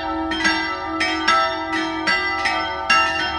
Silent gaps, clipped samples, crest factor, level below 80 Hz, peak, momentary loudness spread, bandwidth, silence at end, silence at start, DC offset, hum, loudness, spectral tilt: none; under 0.1%; 18 dB; -44 dBFS; -2 dBFS; 6 LU; 11.5 kHz; 0 s; 0 s; under 0.1%; none; -19 LUFS; -2.5 dB/octave